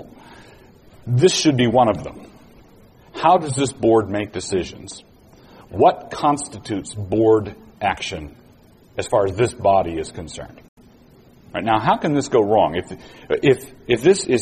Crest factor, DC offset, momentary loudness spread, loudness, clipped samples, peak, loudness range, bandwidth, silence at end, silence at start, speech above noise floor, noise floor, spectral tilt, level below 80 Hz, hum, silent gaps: 18 dB; under 0.1%; 18 LU; -19 LUFS; under 0.1%; -2 dBFS; 4 LU; 14 kHz; 0 s; 0 s; 31 dB; -50 dBFS; -5 dB/octave; -48 dBFS; none; 10.68-10.77 s